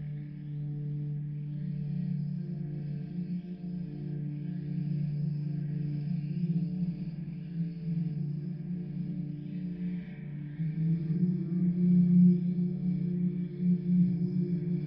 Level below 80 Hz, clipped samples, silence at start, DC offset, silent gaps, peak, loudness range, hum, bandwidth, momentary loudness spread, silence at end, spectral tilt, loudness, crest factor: -60 dBFS; under 0.1%; 0 s; under 0.1%; none; -14 dBFS; 9 LU; none; 5 kHz; 11 LU; 0 s; -12 dB/octave; -32 LUFS; 16 dB